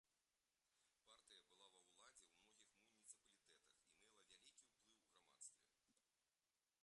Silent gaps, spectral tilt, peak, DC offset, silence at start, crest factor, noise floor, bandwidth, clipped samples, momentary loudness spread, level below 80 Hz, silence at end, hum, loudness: none; 0.5 dB/octave; -48 dBFS; under 0.1%; 0.05 s; 26 dB; under -90 dBFS; 11 kHz; under 0.1%; 6 LU; under -90 dBFS; 0 s; none; -67 LUFS